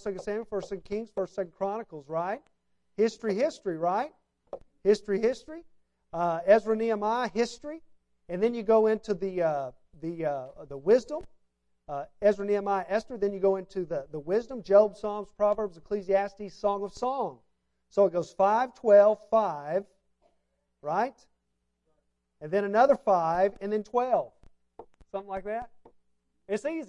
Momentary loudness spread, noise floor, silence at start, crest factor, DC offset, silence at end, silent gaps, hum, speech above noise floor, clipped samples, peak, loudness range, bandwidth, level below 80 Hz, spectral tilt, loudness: 16 LU; -78 dBFS; 0.05 s; 20 dB; under 0.1%; 0.05 s; none; none; 51 dB; under 0.1%; -8 dBFS; 6 LU; 10.5 kHz; -62 dBFS; -6 dB/octave; -28 LUFS